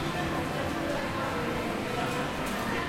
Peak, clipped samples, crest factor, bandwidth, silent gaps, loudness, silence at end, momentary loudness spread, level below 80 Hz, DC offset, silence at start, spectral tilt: -18 dBFS; under 0.1%; 14 dB; 16.5 kHz; none; -31 LUFS; 0 s; 1 LU; -48 dBFS; under 0.1%; 0 s; -5 dB/octave